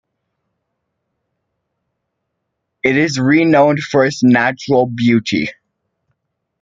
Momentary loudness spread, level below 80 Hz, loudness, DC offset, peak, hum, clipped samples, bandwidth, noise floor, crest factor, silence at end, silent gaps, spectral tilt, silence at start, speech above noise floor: 8 LU; -56 dBFS; -14 LUFS; under 0.1%; -2 dBFS; none; under 0.1%; 7.8 kHz; -74 dBFS; 16 dB; 1.1 s; none; -6 dB/octave; 2.85 s; 61 dB